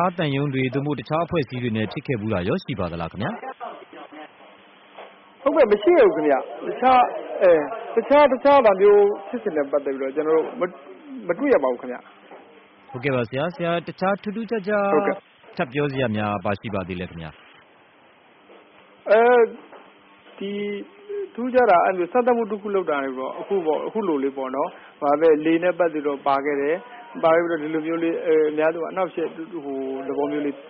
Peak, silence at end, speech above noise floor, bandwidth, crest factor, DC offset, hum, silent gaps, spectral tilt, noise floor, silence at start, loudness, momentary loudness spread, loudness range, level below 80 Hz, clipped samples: -6 dBFS; 0 s; 32 dB; 5.6 kHz; 16 dB; under 0.1%; none; none; -5 dB/octave; -53 dBFS; 0 s; -21 LUFS; 16 LU; 9 LU; -58 dBFS; under 0.1%